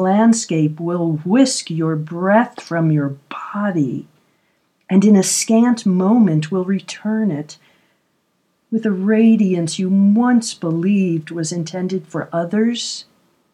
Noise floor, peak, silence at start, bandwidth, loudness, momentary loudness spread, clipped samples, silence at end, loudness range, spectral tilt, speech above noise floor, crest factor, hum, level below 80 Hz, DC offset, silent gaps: -65 dBFS; 0 dBFS; 0 s; 13.5 kHz; -17 LUFS; 10 LU; under 0.1%; 0.5 s; 4 LU; -5.5 dB/octave; 49 dB; 16 dB; none; -72 dBFS; under 0.1%; none